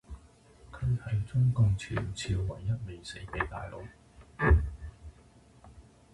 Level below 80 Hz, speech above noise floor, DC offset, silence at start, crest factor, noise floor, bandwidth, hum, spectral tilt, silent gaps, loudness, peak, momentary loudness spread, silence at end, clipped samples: -38 dBFS; 27 dB; under 0.1%; 0.1 s; 20 dB; -58 dBFS; 11.5 kHz; none; -6.5 dB/octave; none; -31 LUFS; -12 dBFS; 24 LU; 0.3 s; under 0.1%